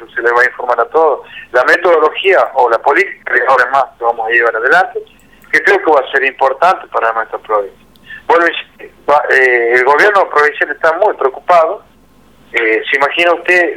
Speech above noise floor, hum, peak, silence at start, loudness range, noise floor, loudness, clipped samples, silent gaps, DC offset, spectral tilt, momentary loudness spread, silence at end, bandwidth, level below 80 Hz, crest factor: 35 dB; none; 0 dBFS; 0 s; 3 LU; -46 dBFS; -11 LUFS; under 0.1%; none; 0.2%; -3 dB/octave; 8 LU; 0 s; 15.5 kHz; -56 dBFS; 12 dB